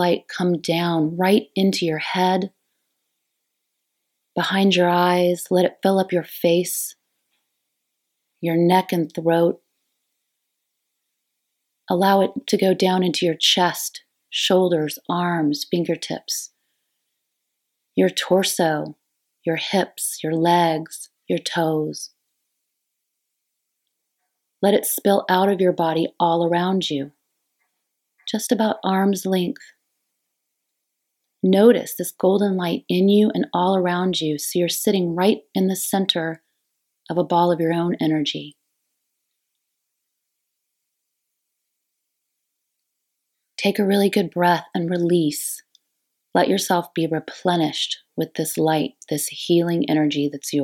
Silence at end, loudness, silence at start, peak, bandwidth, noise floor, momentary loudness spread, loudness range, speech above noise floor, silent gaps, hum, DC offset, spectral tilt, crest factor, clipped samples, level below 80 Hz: 0 s; -20 LUFS; 0 s; -2 dBFS; 17.5 kHz; -78 dBFS; 10 LU; 5 LU; 58 dB; none; none; under 0.1%; -5 dB/octave; 20 dB; under 0.1%; -76 dBFS